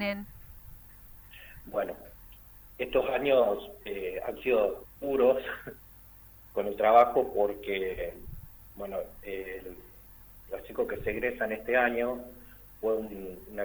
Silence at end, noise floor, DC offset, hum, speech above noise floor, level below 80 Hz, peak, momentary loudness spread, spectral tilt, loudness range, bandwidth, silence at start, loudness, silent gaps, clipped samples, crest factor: 0 s; -53 dBFS; under 0.1%; 50 Hz at -60 dBFS; 24 dB; -54 dBFS; -10 dBFS; 25 LU; -6 dB/octave; 9 LU; over 20 kHz; 0 s; -30 LUFS; none; under 0.1%; 22 dB